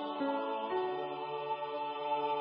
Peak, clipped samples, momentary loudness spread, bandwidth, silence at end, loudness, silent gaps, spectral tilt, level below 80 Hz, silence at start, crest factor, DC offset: -24 dBFS; under 0.1%; 4 LU; 5.2 kHz; 0 s; -36 LUFS; none; -2.5 dB/octave; -88 dBFS; 0 s; 12 dB; under 0.1%